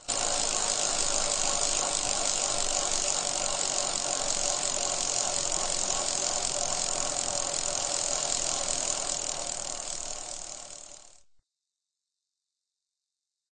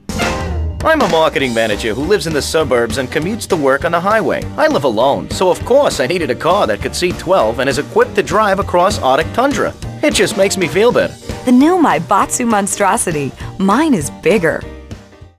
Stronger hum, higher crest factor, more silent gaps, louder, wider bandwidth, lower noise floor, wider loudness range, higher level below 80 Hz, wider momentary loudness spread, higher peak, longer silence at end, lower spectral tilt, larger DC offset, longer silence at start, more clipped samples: neither; first, 22 dB vs 12 dB; neither; second, -27 LUFS vs -14 LUFS; second, 9.6 kHz vs 16 kHz; first, -88 dBFS vs -34 dBFS; first, 11 LU vs 2 LU; second, -48 dBFS vs -34 dBFS; about the same, 8 LU vs 6 LU; second, -10 dBFS vs -2 dBFS; first, 2.55 s vs 0.15 s; second, 0 dB/octave vs -4.5 dB/octave; first, 0.2% vs under 0.1%; about the same, 0 s vs 0.1 s; neither